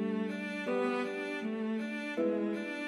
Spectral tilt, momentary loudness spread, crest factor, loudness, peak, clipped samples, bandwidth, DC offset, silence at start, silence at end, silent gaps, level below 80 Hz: -6 dB/octave; 4 LU; 12 dB; -35 LUFS; -22 dBFS; under 0.1%; 12 kHz; under 0.1%; 0 s; 0 s; none; under -90 dBFS